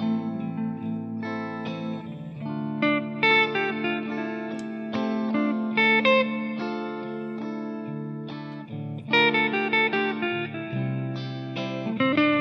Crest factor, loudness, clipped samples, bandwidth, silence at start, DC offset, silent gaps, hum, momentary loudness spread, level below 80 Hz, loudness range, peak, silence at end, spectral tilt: 20 dB; -26 LUFS; under 0.1%; 7.8 kHz; 0 s; under 0.1%; none; none; 14 LU; -74 dBFS; 3 LU; -6 dBFS; 0 s; -7 dB/octave